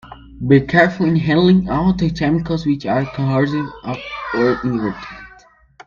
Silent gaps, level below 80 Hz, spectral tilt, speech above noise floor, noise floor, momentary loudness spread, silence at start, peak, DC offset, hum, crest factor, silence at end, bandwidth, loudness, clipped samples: none; -40 dBFS; -8 dB/octave; 31 dB; -48 dBFS; 13 LU; 0.05 s; 0 dBFS; under 0.1%; none; 18 dB; 0.6 s; 7.2 kHz; -17 LUFS; under 0.1%